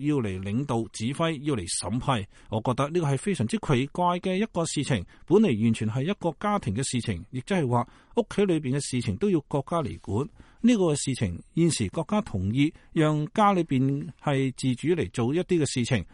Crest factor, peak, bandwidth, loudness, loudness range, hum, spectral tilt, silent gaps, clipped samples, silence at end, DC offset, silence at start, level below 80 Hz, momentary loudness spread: 16 dB; -10 dBFS; 11.5 kHz; -27 LUFS; 2 LU; none; -6 dB/octave; none; under 0.1%; 0.1 s; under 0.1%; 0 s; -52 dBFS; 7 LU